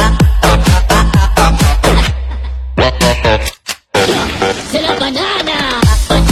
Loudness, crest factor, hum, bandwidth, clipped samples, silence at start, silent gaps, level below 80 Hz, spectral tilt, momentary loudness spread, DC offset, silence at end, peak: -12 LUFS; 10 dB; none; 14 kHz; under 0.1%; 0 s; none; -14 dBFS; -4.5 dB/octave; 7 LU; under 0.1%; 0 s; 0 dBFS